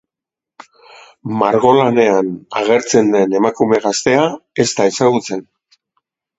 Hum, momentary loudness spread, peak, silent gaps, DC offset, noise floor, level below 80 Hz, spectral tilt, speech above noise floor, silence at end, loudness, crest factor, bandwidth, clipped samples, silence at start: none; 9 LU; 0 dBFS; none; under 0.1%; -86 dBFS; -58 dBFS; -4.5 dB/octave; 73 dB; 0.95 s; -14 LUFS; 16 dB; 8.2 kHz; under 0.1%; 1.25 s